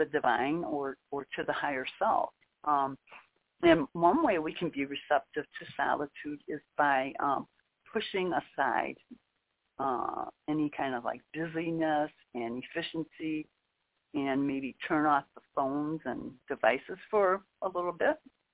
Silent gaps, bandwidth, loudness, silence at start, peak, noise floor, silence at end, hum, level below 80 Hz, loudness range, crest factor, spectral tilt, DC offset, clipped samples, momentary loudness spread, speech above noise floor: none; 4 kHz; -32 LUFS; 0 s; -8 dBFS; -80 dBFS; 0.35 s; none; -66 dBFS; 5 LU; 24 dB; -3.5 dB/octave; under 0.1%; under 0.1%; 11 LU; 48 dB